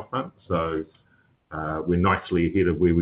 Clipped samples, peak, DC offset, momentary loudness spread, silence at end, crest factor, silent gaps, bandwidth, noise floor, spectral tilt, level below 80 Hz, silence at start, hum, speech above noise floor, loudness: under 0.1%; -8 dBFS; under 0.1%; 11 LU; 0 s; 16 dB; none; 4.6 kHz; -62 dBFS; -12 dB/octave; -44 dBFS; 0 s; none; 39 dB; -25 LUFS